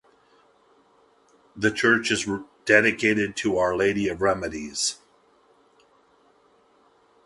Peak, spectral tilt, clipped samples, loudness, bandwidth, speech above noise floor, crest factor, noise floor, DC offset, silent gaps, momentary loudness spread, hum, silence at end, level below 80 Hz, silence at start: -4 dBFS; -3.5 dB/octave; under 0.1%; -23 LUFS; 11.5 kHz; 38 dB; 24 dB; -60 dBFS; under 0.1%; none; 11 LU; none; 2.3 s; -56 dBFS; 1.55 s